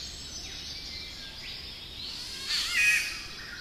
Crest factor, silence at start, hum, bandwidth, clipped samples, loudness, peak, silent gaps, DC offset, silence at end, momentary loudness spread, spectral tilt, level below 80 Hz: 20 dB; 0 s; none; 16 kHz; under 0.1%; -30 LUFS; -14 dBFS; none; under 0.1%; 0 s; 16 LU; 0 dB/octave; -52 dBFS